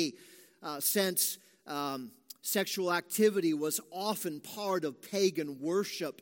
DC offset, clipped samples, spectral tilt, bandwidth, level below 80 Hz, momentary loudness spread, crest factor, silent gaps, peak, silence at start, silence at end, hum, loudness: under 0.1%; under 0.1%; -3 dB/octave; 17 kHz; -86 dBFS; 13 LU; 18 dB; none; -14 dBFS; 0 s; 0.1 s; none; -32 LUFS